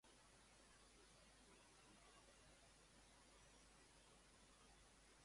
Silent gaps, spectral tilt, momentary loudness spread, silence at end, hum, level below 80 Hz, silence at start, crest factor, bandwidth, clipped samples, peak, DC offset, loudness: none; -2.5 dB/octave; 1 LU; 0 s; none; -78 dBFS; 0.05 s; 14 dB; 11.5 kHz; under 0.1%; -56 dBFS; under 0.1%; -69 LUFS